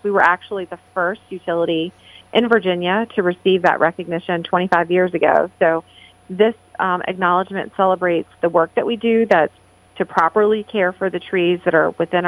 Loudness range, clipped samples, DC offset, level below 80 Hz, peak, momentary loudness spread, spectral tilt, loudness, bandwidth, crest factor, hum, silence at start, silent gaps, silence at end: 2 LU; under 0.1%; under 0.1%; -62 dBFS; 0 dBFS; 8 LU; -7 dB/octave; -18 LUFS; 10.5 kHz; 18 dB; none; 0.05 s; none; 0 s